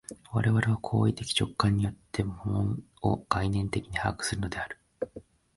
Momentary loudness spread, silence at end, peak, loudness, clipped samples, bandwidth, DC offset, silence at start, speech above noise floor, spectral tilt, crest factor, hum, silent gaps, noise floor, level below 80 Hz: 10 LU; 0.35 s; -10 dBFS; -30 LUFS; under 0.1%; 11.5 kHz; under 0.1%; 0.1 s; 22 dB; -5.5 dB/octave; 20 dB; none; none; -50 dBFS; -46 dBFS